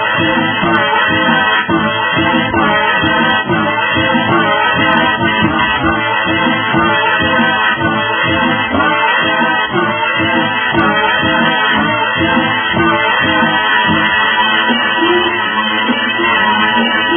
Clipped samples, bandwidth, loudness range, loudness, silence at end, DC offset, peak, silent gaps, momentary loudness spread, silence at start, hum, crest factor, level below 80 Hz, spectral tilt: under 0.1%; 3.5 kHz; 1 LU; -11 LUFS; 0 s; under 0.1%; 0 dBFS; none; 2 LU; 0 s; none; 12 dB; -42 dBFS; -8 dB/octave